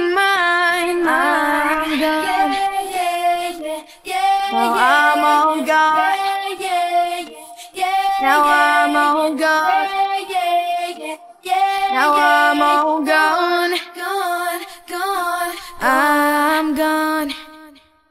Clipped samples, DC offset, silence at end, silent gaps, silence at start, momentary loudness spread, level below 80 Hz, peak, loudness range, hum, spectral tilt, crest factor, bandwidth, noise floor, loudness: under 0.1%; under 0.1%; 0.4 s; none; 0 s; 11 LU; -54 dBFS; -2 dBFS; 3 LU; none; -1.5 dB/octave; 16 dB; 16.5 kHz; -45 dBFS; -16 LUFS